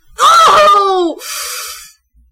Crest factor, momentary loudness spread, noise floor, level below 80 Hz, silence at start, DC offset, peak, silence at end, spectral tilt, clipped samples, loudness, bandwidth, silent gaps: 10 dB; 18 LU; -42 dBFS; -46 dBFS; 0.2 s; under 0.1%; -2 dBFS; 0.45 s; -1 dB/octave; under 0.1%; -9 LUFS; 16.5 kHz; none